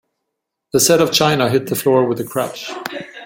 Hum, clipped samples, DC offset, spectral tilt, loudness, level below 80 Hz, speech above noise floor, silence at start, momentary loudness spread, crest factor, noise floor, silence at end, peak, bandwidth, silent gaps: none; under 0.1%; under 0.1%; -3.5 dB/octave; -16 LUFS; -56 dBFS; 62 dB; 0.75 s; 14 LU; 18 dB; -77 dBFS; 0 s; 0 dBFS; 17 kHz; none